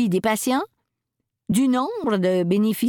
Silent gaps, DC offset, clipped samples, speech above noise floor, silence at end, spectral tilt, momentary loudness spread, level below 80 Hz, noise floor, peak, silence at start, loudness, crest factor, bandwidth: none; under 0.1%; under 0.1%; 60 dB; 0 s; -5.5 dB/octave; 6 LU; -60 dBFS; -80 dBFS; -8 dBFS; 0 s; -22 LUFS; 14 dB; 19 kHz